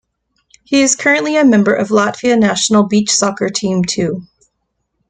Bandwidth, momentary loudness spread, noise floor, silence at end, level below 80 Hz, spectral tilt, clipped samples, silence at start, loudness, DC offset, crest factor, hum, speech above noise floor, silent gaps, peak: 9.4 kHz; 6 LU; -70 dBFS; 0.85 s; -52 dBFS; -4 dB/octave; under 0.1%; 0.7 s; -13 LUFS; under 0.1%; 14 dB; none; 57 dB; none; 0 dBFS